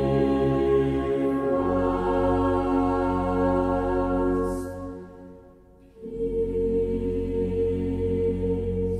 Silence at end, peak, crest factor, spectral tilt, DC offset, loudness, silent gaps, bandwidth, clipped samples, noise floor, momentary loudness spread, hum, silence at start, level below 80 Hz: 0 s; -12 dBFS; 14 dB; -9 dB/octave; under 0.1%; -25 LUFS; none; 11 kHz; under 0.1%; -51 dBFS; 9 LU; none; 0 s; -38 dBFS